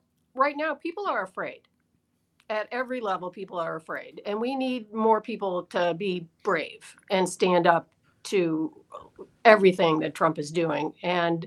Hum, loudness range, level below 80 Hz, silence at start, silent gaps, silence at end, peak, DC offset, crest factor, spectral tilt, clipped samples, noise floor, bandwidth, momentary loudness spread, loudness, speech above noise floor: none; 9 LU; -74 dBFS; 0.35 s; none; 0 s; 0 dBFS; under 0.1%; 26 dB; -5.5 dB/octave; under 0.1%; -72 dBFS; 12.5 kHz; 14 LU; -26 LUFS; 46 dB